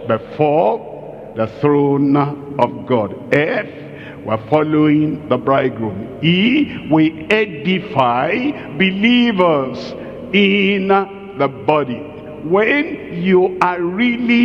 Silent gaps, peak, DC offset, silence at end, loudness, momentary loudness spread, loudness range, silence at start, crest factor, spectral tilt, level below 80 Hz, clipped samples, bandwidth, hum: none; 0 dBFS; under 0.1%; 0 s; -16 LUFS; 12 LU; 2 LU; 0 s; 16 dB; -7.5 dB/octave; -52 dBFS; under 0.1%; 7.4 kHz; none